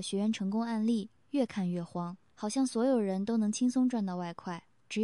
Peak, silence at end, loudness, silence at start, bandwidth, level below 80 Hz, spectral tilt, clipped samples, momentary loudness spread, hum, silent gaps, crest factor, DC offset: -18 dBFS; 0 s; -32 LUFS; 0 s; 11.5 kHz; -76 dBFS; -6 dB/octave; under 0.1%; 11 LU; none; none; 14 dB; under 0.1%